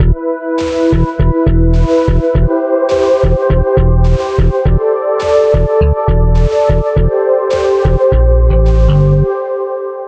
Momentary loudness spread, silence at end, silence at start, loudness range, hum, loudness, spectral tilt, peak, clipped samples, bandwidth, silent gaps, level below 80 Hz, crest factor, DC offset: 3 LU; 0 s; 0 s; 1 LU; none; -12 LUFS; -8.5 dB/octave; 0 dBFS; under 0.1%; 8 kHz; none; -14 dBFS; 10 dB; under 0.1%